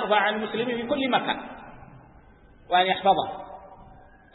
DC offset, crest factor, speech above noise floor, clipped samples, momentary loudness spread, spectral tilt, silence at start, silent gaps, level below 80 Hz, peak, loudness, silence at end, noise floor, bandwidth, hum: under 0.1%; 20 dB; 28 dB; under 0.1%; 21 LU; -8.5 dB/octave; 0 s; none; -56 dBFS; -8 dBFS; -25 LUFS; 0.4 s; -52 dBFS; 4.1 kHz; none